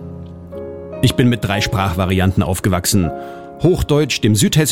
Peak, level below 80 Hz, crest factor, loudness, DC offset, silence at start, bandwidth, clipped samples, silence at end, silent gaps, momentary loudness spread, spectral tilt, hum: -2 dBFS; -34 dBFS; 14 dB; -16 LUFS; under 0.1%; 0 s; 17 kHz; under 0.1%; 0 s; none; 17 LU; -5 dB/octave; none